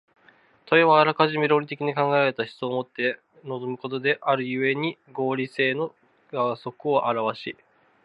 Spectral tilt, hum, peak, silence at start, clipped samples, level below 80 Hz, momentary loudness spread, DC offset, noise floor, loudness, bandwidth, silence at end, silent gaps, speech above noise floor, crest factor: -7.5 dB/octave; none; -2 dBFS; 0.7 s; under 0.1%; -76 dBFS; 13 LU; under 0.1%; -58 dBFS; -24 LUFS; 7.8 kHz; 0.5 s; none; 34 dB; 22 dB